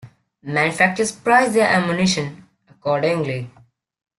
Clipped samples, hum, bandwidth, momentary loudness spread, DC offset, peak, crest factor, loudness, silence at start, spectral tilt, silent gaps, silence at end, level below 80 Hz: under 0.1%; none; 12.5 kHz; 14 LU; under 0.1%; -2 dBFS; 18 dB; -18 LUFS; 0.05 s; -4.5 dB/octave; none; 0.7 s; -58 dBFS